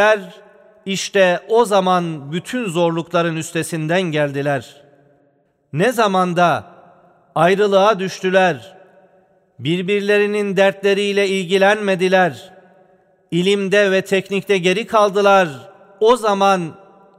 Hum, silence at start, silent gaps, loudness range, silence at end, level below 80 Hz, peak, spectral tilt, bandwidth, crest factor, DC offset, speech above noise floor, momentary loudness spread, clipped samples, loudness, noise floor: none; 0 s; none; 4 LU; 0.45 s; -64 dBFS; -2 dBFS; -5 dB/octave; 15 kHz; 16 dB; under 0.1%; 44 dB; 9 LU; under 0.1%; -17 LUFS; -60 dBFS